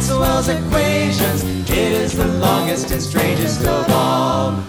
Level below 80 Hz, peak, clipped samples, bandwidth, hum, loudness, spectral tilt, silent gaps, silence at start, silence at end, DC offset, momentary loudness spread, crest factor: -30 dBFS; 0 dBFS; under 0.1%; over 20 kHz; none; -17 LUFS; -5 dB/octave; none; 0 s; 0 s; under 0.1%; 3 LU; 16 dB